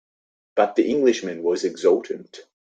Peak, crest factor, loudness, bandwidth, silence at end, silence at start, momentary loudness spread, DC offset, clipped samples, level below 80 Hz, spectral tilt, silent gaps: -4 dBFS; 20 dB; -21 LUFS; 9 kHz; 0.3 s; 0.55 s; 9 LU; under 0.1%; under 0.1%; -68 dBFS; -4.5 dB/octave; none